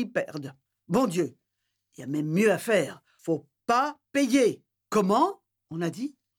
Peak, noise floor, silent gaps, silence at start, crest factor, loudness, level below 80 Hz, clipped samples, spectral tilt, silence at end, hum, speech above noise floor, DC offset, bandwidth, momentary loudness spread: -12 dBFS; -81 dBFS; none; 0 s; 16 dB; -27 LUFS; -70 dBFS; under 0.1%; -5.5 dB/octave; 0.3 s; none; 55 dB; under 0.1%; 18.5 kHz; 17 LU